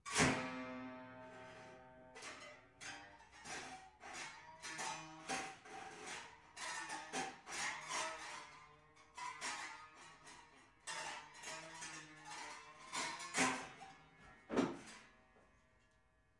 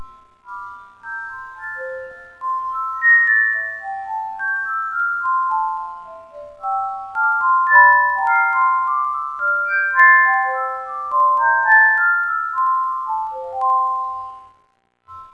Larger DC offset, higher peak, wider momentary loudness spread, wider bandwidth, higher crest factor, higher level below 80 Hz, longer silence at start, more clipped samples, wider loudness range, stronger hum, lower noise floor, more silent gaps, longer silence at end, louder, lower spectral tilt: neither; second, -20 dBFS vs 0 dBFS; about the same, 18 LU vs 20 LU; first, 11.5 kHz vs 6.6 kHz; first, 28 dB vs 18 dB; second, -74 dBFS vs -64 dBFS; about the same, 0.05 s vs 0 s; neither; about the same, 8 LU vs 7 LU; second, none vs 60 Hz at -70 dBFS; first, -75 dBFS vs -62 dBFS; neither; first, 0.85 s vs 0.05 s; second, -45 LUFS vs -16 LUFS; about the same, -2.5 dB/octave vs -2.5 dB/octave